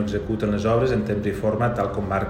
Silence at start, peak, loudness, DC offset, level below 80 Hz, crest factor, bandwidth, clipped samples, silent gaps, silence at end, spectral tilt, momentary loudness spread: 0 s; -8 dBFS; -23 LUFS; under 0.1%; -40 dBFS; 14 dB; 15 kHz; under 0.1%; none; 0 s; -8 dB/octave; 4 LU